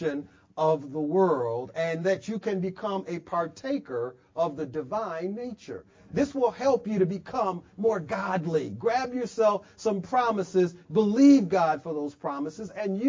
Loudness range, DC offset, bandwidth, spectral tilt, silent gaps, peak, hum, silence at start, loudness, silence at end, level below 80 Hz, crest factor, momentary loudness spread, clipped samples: 7 LU; under 0.1%; 7.6 kHz; -7 dB/octave; none; -8 dBFS; none; 0 s; -27 LUFS; 0 s; -64 dBFS; 18 dB; 10 LU; under 0.1%